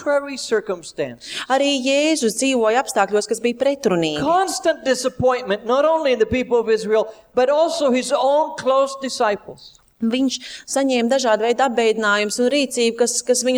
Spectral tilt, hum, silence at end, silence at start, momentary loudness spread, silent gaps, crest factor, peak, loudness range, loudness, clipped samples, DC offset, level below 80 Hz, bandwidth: -3 dB/octave; none; 0 s; 0 s; 5 LU; none; 16 dB; -4 dBFS; 2 LU; -19 LUFS; under 0.1%; under 0.1%; -54 dBFS; over 20 kHz